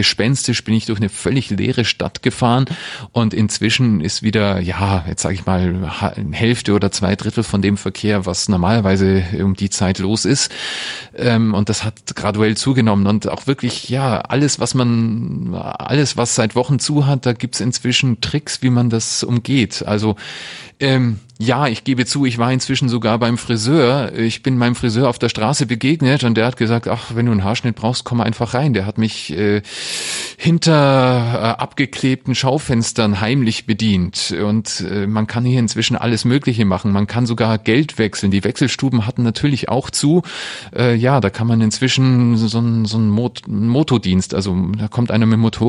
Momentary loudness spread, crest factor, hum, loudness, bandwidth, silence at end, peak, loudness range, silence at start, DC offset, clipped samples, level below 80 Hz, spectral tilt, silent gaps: 6 LU; 14 dB; none; -17 LUFS; 12 kHz; 0 s; -2 dBFS; 2 LU; 0 s; under 0.1%; under 0.1%; -44 dBFS; -5.5 dB/octave; none